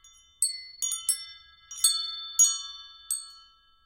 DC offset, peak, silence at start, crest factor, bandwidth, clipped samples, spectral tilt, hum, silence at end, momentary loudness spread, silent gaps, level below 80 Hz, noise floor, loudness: under 0.1%; -8 dBFS; 0.05 s; 24 dB; 16.5 kHz; under 0.1%; 6.5 dB/octave; none; 0.45 s; 22 LU; none; -70 dBFS; -57 dBFS; -26 LUFS